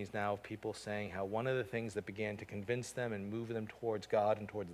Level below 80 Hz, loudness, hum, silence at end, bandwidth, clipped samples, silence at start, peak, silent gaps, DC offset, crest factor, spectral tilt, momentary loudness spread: -66 dBFS; -39 LUFS; none; 0 s; 16 kHz; under 0.1%; 0 s; -22 dBFS; none; under 0.1%; 18 dB; -6 dB/octave; 8 LU